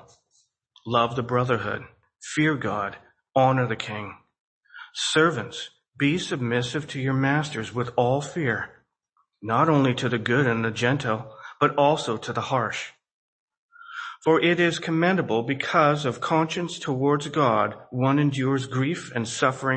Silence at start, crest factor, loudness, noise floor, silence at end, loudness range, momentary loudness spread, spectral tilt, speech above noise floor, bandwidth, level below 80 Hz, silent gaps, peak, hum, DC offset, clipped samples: 0.85 s; 20 dB; -24 LUFS; -71 dBFS; 0 s; 4 LU; 13 LU; -5.5 dB/octave; 48 dB; 8.8 kHz; -62 dBFS; 4.40-4.61 s, 13.11-13.48 s, 13.57-13.69 s; -4 dBFS; none; under 0.1%; under 0.1%